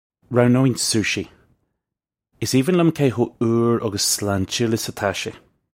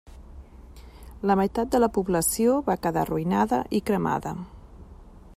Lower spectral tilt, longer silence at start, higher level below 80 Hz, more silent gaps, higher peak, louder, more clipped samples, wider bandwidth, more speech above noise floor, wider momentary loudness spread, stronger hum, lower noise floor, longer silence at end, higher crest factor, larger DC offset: about the same, -4.5 dB/octave vs -5.5 dB/octave; first, 0.3 s vs 0.05 s; second, -56 dBFS vs -46 dBFS; neither; first, 0 dBFS vs -8 dBFS; first, -20 LUFS vs -25 LUFS; neither; about the same, 16.5 kHz vs 16 kHz; first, 67 dB vs 23 dB; about the same, 9 LU vs 8 LU; neither; first, -86 dBFS vs -46 dBFS; first, 0.45 s vs 0.1 s; about the same, 20 dB vs 18 dB; neither